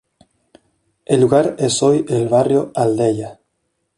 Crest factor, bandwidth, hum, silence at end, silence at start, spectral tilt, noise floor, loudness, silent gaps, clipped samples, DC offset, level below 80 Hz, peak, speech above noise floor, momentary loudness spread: 16 dB; 11.5 kHz; none; 0.65 s; 1.1 s; -5.5 dB/octave; -70 dBFS; -16 LUFS; none; under 0.1%; under 0.1%; -56 dBFS; -2 dBFS; 55 dB; 6 LU